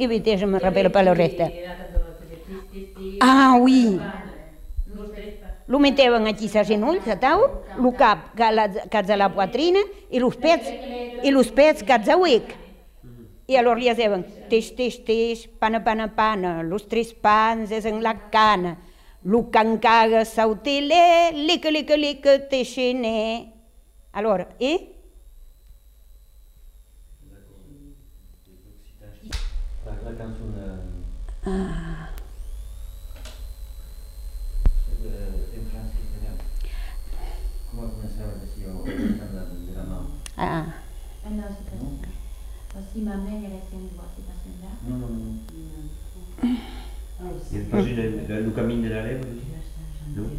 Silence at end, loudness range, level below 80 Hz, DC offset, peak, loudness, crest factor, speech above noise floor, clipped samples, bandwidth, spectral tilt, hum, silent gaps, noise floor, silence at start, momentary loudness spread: 0 s; 16 LU; -34 dBFS; under 0.1%; -4 dBFS; -21 LUFS; 20 dB; 31 dB; under 0.1%; 15.5 kHz; -5.5 dB/octave; none; none; -51 dBFS; 0 s; 22 LU